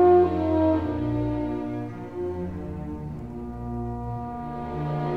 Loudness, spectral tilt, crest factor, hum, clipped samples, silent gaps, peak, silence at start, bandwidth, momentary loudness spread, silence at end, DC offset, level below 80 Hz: -28 LUFS; -10 dB/octave; 18 dB; none; under 0.1%; none; -8 dBFS; 0 s; 5 kHz; 13 LU; 0 s; 0.3%; -42 dBFS